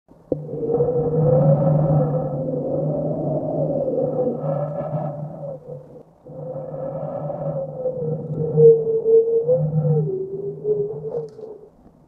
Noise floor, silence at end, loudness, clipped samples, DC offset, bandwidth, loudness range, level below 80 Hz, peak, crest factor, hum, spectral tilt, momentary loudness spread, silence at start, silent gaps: -48 dBFS; 0.4 s; -21 LUFS; under 0.1%; under 0.1%; 1.9 kHz; 10 LU; -52 dBFS; -2 dBFS; 18 dB; none; -13.5 dB/octave; 16 LU; 0.3 s; none